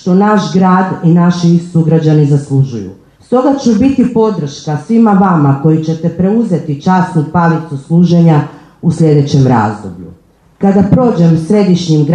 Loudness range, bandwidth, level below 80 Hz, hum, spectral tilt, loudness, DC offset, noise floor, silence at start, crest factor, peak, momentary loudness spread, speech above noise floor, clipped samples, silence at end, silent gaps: 1 LU; 9.2 kHz; -44 dBFS; none; -8 dB/octave; -10 LUFS; under 0.1%; -41 dBFS; 0.05 s; 10 dB; 0 dBFS; 9 LU; 32 dB; under 0.1%; 0 s; none